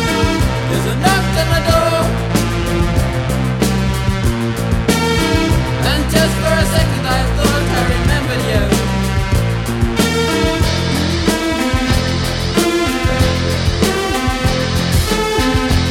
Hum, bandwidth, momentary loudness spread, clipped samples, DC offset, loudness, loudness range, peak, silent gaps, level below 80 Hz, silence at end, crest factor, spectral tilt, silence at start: none; 17 kHz; 3 LU; under 0.1%; under 0.1%; -15 LUFS; 1 LU; 0 dBFS; none; -22 dBFS; 0 s; 14 dB; -5 dB/octave; 0 s